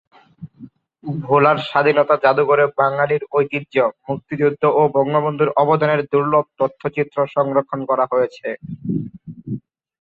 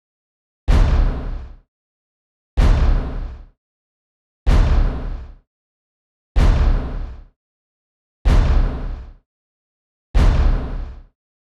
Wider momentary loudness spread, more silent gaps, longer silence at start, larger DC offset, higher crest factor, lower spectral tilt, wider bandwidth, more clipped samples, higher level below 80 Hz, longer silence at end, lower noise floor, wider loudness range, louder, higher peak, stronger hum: second, 14 LU vs 17 LU; second, none vs 1.68-2.57 s, 3.58-4.46 s, 5.47-6.35 s, 7.36-8.25 s, 9.26-10.14 s; second, 0.4 s vs 0.7 s; neither; about the same, 16 dB vs 16 dB; first, -8.5 dB/octave vs -7 dB/octave; second, 5 kHz vs 7.2 kHz; neither; second, -60 dBFS vs -20 dBFS; about the same, 0.5 s vs 0.45 s; second, -43 dBFS vs under -90 dBFS; about the same, 4 LU vs 3 LU; about the same, -18 LUFS vs -20 LUFS; about the same, -2 dBFS vs -4 dBFS; neither